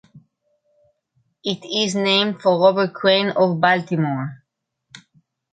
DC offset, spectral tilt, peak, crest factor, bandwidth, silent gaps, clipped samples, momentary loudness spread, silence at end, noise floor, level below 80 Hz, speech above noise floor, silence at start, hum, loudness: under 0.1%; -5 dB/octave; -4 dBFS; 18 dB; 9.2 kHz; none; under 0.1%; 11 LU; 1.15 s; -71 dBFS; -68 dBFS; 53 dB; 0.15 s; none; -18 LUFS